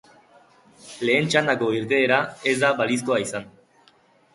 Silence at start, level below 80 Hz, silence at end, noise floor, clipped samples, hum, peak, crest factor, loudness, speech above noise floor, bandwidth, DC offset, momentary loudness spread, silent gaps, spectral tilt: 0.85 s; -64 dBFS; 0.85 s; -58 dBFS; under 0.1%; none; -4 dBFS; 20 dB; -21 LUFS; 36 dB; 11.5 kHz; under 0.1%; 10 LU; none; -4 dB/octave